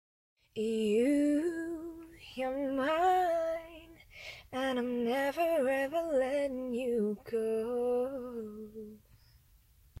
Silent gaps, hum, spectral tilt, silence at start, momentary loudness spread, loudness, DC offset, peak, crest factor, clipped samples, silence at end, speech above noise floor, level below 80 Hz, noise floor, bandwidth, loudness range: none; none; -5.5 dB/octave; 0.55 s; 18 LU; -32 LUFS; under 0.1%; -18 dBFS; 14 dB; under 0.1%; 1.05 s; 31 dB; -64 dBFS; -64 dBFS; 16 kHz; 4 LU